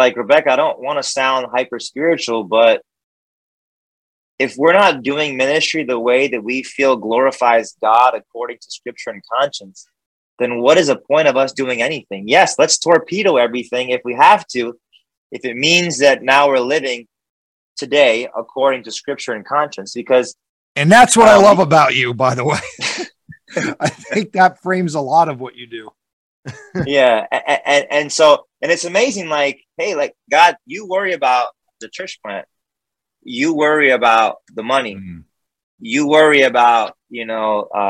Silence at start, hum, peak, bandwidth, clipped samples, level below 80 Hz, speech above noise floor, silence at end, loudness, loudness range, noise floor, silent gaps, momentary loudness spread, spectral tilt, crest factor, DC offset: 0 s; none; 0 dBFS; 12.5 kHz; under 0.1%; -58 dBFS; 68 dB; 0 s; -14 LUFS; 6 LU; -83 dBFS; 3.04-4.38 s, 10.06-10.37 s, 15.17-15.30 s, 17.30-17.76 s, 20.49-20.75 s, 26.13-26.43 s, 35.63-35.78 s; 16 LU; -3.5 dB/octave; 16 dB; under 0.1%